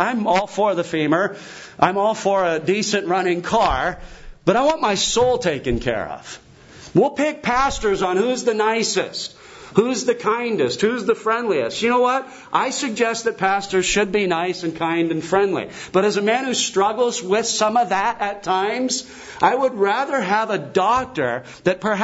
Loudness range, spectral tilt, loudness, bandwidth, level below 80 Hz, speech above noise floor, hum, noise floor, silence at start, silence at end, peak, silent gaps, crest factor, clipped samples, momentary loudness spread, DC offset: 1 LU; -3.5 dB/octave; -20 LUFS; 8 kHz; -44 dBFS; 23 dB; none; -43 dBFS; 0 s; 0 s; 0 dBFS; none; 20 dB; under 0.1%; 6 LU; under 0.1%